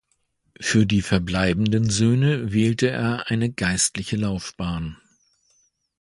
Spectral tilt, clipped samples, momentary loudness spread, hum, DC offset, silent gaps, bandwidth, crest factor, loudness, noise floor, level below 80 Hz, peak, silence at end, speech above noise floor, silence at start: -5 dB/octave; under 0.1%; 9 LU; none; under 0.1%; none; 11.5 kHz; 20 dB; -22 LUFS; -69 dBFS; -44 dBFS; -2 dBFS; 1.05 s; 48 dB; 0.6 s